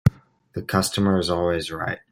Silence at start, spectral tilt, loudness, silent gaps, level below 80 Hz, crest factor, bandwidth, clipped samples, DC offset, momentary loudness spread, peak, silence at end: 0.05 s; -5.5 dB/octave; -23 LUFS; none; -44 dBFS; 20 dB; 16 kHz; under 0.1%; under 0.1%; 10 LU; -2 dBFS; 0.15 s